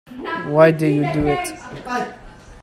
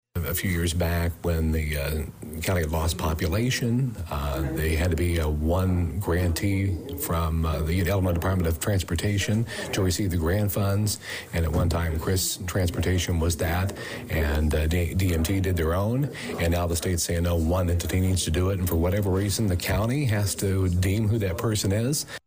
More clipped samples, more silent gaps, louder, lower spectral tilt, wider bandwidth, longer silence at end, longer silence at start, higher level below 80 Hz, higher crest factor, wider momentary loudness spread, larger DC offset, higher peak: neither; neither; first, -19 LUFS vs -25 LUFS; about the same, -6.5 dB/octave vs -5.5 dB/octave; about the same, 15 kHz vs 16 kHz; about the same, 0.05 s vs 0.1 s; about the same, 0.1 s vs 0.15 s; second, -42 dBFS vs -34 dBFS; first, 20 dB vs 10 dB; first, 15 LU vs 4 LU; neither; first, 0 dBFS vs -14 dBFS